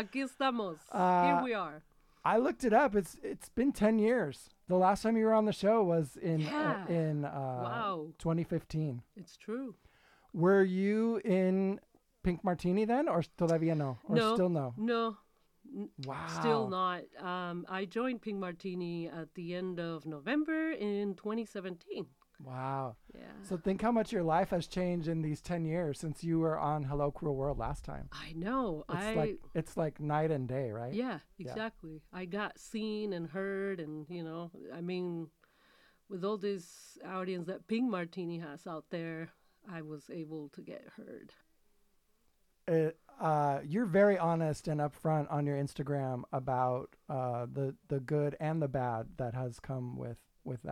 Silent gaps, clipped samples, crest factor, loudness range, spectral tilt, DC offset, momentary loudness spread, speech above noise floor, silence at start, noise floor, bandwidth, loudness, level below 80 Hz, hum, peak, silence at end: none; under 0.1%; 20 dB; 9 LU; -7 dB/octave; under 0.1%; 16 LU; 38 dB; 0 s; -72 dBFS; 14.5 kHz; -34 LUFS; -58 dBFS; none; -16 dBFS; 0 s